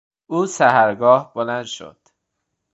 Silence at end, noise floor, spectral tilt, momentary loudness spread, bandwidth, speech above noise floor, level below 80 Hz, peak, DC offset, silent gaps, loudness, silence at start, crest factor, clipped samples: 0.85 s; -76 dBFS; -4.5 dB/octave; 14 LU; 8.2 kHz; 59 dB; -68 dBFS; 0 dBFS; under 0.1%; none; -17 LUFS; 0.3 s; 18 dB; under 0.1%